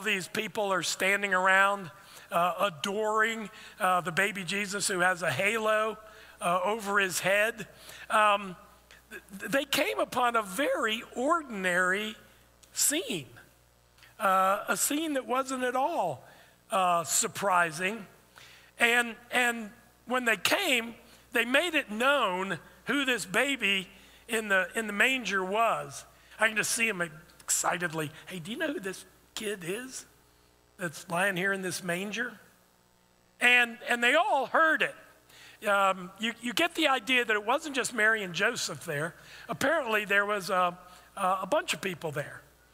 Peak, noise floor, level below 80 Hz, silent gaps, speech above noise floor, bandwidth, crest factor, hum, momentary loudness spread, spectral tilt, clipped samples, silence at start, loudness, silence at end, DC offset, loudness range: -8 dBFS; -65 dBFS; -68 dBFS; none; 36 dB; 16 kHz; 22 dB; none; 13 LU; -2.5 dB/octave; under 0.1%; 0 s; -28 LUFS; 0.35 s; under 0.1%; 4 LU